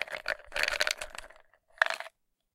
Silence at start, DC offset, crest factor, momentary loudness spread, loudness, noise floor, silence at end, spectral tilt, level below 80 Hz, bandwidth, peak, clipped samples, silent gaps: 0 s; under 0.1%; 30 dB; 15 LU; -31 LUFS; -60 dBFS; 0.45 s; 1 dB/octave; -58 dBFS; 16.5 kHz; -6 dBFS; under 0.1%; none